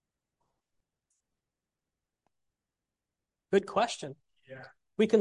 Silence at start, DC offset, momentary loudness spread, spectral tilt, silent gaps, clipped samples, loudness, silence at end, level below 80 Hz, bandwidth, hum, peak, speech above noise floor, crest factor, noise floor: 3.5 s; under 0.1%; 22 LU; -5 dB/octave; none; under 0.1%; -30 LUFS; 0 s; -76 dBFS; 11.5 kHz; none; -12 dBFS; 58 dB; 24 dB; -90 dBFS